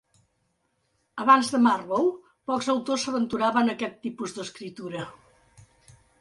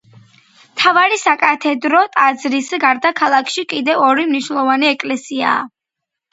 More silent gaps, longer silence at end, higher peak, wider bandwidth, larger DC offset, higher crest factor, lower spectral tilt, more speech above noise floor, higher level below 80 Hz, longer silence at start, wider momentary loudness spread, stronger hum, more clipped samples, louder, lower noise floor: neither; first, 1.1 s vs 0.65 s; second, -6 dBFS vs 0 dBFS; first, 11.5 kHz vs 8 kHz; neither; about the same, 20 dB vs 16 dB; first, -4 dB/octave vs -2.5 dB/octave; second, 48 dB vs 66 dB; about the same, -68 dBFS vs -68 dBFS; first, 1.15 s vs 0.75 s; first, 17 LU vs 8 LU; neither; neither; second, -25 LUFS vs -14 LUFS; second, -73 dBFS vs -81 dBFS